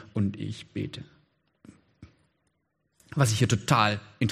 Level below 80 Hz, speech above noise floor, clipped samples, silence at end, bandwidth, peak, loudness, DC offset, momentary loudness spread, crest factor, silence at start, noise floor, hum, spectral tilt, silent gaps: -60 dBFS; 49 dB; under 0.1%; 0 s; 14.5 kHz; -6 dBFS; -27 LUFS; under 0.1%; 14 LU; 24 dB; 0 s; -76 dBFS; none; -5 dB/octave; none